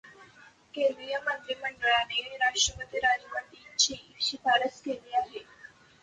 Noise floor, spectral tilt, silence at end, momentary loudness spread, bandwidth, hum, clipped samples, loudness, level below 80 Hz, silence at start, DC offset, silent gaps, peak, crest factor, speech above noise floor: -56 dBFS; 0 dB/octave; 0.35 s; 12 LU; 10 kHz; none; under 0.1%; -29 LUFS; -60 dBFS; 0.05 s; under 0.1%; none; -10 dBFS; 20 dB; 26 dB